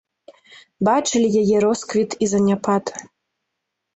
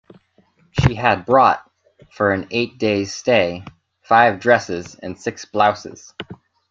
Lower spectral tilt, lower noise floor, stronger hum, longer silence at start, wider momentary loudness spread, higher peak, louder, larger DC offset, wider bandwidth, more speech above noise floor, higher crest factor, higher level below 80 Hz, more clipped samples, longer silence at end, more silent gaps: about the same, -5 dB/octave vs -5.5 dB/octave; first, -79 dBFS vs -58 dBFS; neither; about the same, 0.8 s vs 0.75 s; second, 6 LU vs 19 LU; second, -6 dBFS vs 0 dBFS; about the same, -19 LUFS vs -18 LUFS; neither; about the same, 8.2 kHz vs 7.8 kHz; first, 60 dB vs 40 dB; about the same, 16 dB vs 18 dB; second, -58 dBFS vs -44 dBFS; neither; first, 0.9 s vs 0.35 s; neither